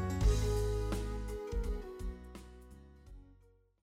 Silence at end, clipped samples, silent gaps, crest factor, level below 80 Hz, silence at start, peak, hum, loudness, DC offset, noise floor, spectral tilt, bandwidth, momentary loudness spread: 0.5 s; under 0.1%; none; 18 dB; -38 dBFS; 0 s; -20 dBFS; none; -37 LUFS; under 0.1%; -65 dBFS; -6 dB/octave; 15 kHz; 25 LU